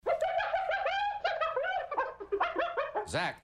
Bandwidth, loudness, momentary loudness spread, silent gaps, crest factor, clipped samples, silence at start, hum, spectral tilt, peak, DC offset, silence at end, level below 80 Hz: 12 kHz; -32 LUFS; 4 LU; none; 14 dB; under 0.1%; 0.05 s; none; -3.5 dB/octave; -18 dBFS; under 0.1%; 0.05 s; -62 dBFS